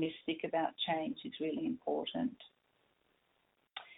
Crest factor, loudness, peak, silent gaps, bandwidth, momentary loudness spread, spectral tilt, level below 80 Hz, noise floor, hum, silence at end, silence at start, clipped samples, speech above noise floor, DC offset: 18 dB; -38 LUFS; -22 dBFS; none; 4.1 kHz; 11 LU; -8 dB/octave; -78 dBFS; -77 dBFS; none; 0.05 s; 0 s; under 0.1%; 40 dB; under 0.1%